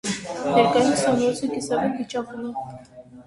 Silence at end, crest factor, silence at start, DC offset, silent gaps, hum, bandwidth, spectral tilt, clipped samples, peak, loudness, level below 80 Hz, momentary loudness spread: 0.05 s; 18 dB; 0.05 s; under 0.1%; none; none; 11.5 kHz; -4.5 dB/octave; under 0.1%; -4 dBFS; -22 LUFS; -58 dBFS; 14 LU